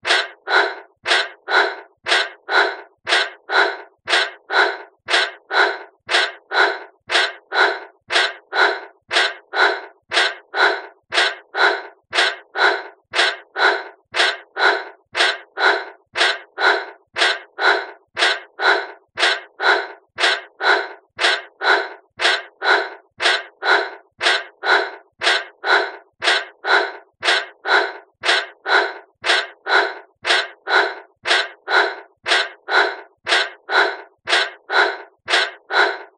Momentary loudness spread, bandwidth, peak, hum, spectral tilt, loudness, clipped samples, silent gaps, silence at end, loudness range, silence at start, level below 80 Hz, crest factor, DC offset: 8 LU; 10 kHz; -2 dBFS; none; 0.5 dB/octave; -18 LUFS; under 0.1%; none; 0.1 s; 0 LU; 0.05 s; -76 dBFS; 18 dB; under 0.1%